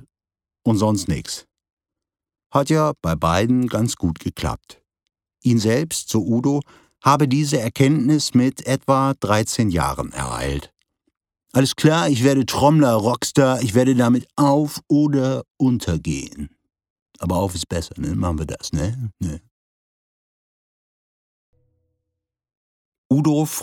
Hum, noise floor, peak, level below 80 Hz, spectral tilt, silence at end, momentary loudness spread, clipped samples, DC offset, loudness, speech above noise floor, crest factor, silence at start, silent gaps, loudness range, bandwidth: none; under -90 dBFS; 0 dBFS; -42 dBFS; -5.5 dB/octave; 0 s; 10 LU; under 0.1%; under 0.1%; -20 LUFS; over 71 dB; 20 dB; 0.65 s; 1.73-1.77 s, 2.46-2.50 s, 15.51-15.55 s, 16.90-16.96 s, 17.02-17.06 s, 19.51-21.53 s, 22.57-22.92 s, 22.98-23.10 s; 10 LU; 18.5 kHz